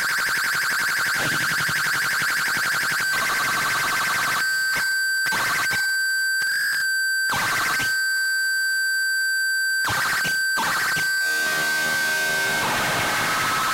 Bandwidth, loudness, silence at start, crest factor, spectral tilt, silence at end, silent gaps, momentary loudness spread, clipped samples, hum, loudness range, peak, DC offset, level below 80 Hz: 16 kHz; -21 LUFS; 0 s; 8 dB; -0.5 dB/octave; 0 s; none; 0 LU; under 0.1%; none; 0 LU; -14 dBFS; under 0.1%; -56 dBFS